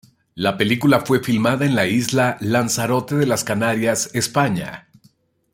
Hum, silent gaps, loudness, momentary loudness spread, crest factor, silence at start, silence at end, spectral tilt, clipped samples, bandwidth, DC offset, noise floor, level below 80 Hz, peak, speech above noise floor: none; none; -19 LUFS; 5 LU; 20 dB; 0.35 s; 0.75 s; -4.5 dB/octave; under 0.1%; 16.5 kHz; under 0.1%; -57 dBFS; -56 dBFS; 0 dBFS; 39 dB